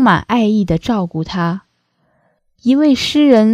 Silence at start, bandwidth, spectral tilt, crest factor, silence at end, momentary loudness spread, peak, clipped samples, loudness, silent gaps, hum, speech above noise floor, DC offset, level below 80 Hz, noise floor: 0 s; 14 kHz; -6 dB/octave; 14 dB; 0 s; 10 LU; 0 dBFS; under 0.1%; -14 LUFS; none; none; 50 dB; under 0.1%; -42 dBFS; -62 dBFS